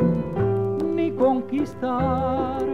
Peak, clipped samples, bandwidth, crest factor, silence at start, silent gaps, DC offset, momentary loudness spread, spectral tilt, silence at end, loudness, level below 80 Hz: -8 dBFS; under 0.1%; 10.5 kHz; 14 dB; 0 s; none; 0.6%; 4 LU; -9.5 dB/octave; 0 s; -23 LUFS; -44 dBFS